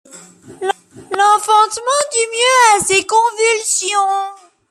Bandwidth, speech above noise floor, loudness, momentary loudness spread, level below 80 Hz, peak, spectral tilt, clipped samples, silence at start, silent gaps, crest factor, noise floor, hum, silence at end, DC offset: 14.5 kHz; 24 dB; -13 LUFS; 12 LU; -58 dBFS; 0 dBFS; 0 dB/octave; under 0.1%; 0.15 s; none; 14 dB; -39 dBFS; none; 0.35 s; under 0.1%